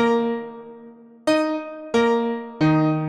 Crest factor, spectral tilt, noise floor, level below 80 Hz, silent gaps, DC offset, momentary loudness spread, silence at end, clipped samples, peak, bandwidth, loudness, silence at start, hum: 14 dB; -7 dB/octave; -45 dBFS; -58 dBFS; none; under 0.1%; 15 LU; 0 s; under 0.1%; -8 dBFS; 10.5 kHz; -22 LUFS; 0 s; none